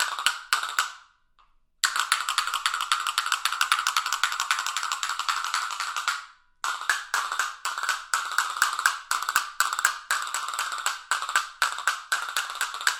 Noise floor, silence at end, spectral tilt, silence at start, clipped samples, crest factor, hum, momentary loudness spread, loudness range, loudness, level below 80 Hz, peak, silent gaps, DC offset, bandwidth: -62 dBFS; 0 s; 4.5 dB/octave; 0 s; under 0.1%; 24 dB; none; 6 LU; 3 LU; -26 LUFS; -68 dBFS; -4 dBFS; none; under 0.1%; 18 kHz